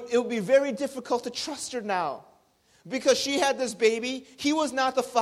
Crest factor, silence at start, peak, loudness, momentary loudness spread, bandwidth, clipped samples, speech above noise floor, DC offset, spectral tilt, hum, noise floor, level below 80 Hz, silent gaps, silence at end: 18 dB; 0 s; -8 dBFS; -26 LUFS; 10 LU; 14.5 kHz; under 0.1%; 37 dB; under 0.1%; -3 dB/octave; none; -63 dBFS; -68 dBFS; none; 0 s